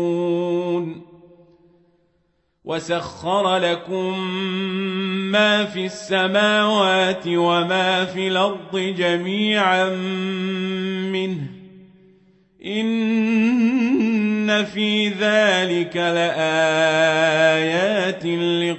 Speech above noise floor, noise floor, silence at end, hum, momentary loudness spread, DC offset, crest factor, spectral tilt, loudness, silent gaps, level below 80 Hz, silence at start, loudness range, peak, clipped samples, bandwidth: 47 dB; -66 dBFS; 0 s; none; 8 LU; under 0.1%; 16 dB; -5 dB/octave; -19 LUFS; none; -66 dBFS; 0 s; 7 LU; -4 dBFS; under 0.1%; 8.4 kHz